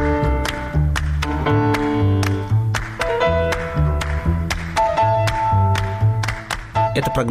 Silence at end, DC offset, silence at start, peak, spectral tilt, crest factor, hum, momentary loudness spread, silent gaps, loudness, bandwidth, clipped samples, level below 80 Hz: 0 s; under 0.1%; 0 s; -8 dBFS; -6 dB/octave; 12 dB; none; 5 LU; none; -19 LUFS; 15.5 kHz; under 0.1%; -26 dBFS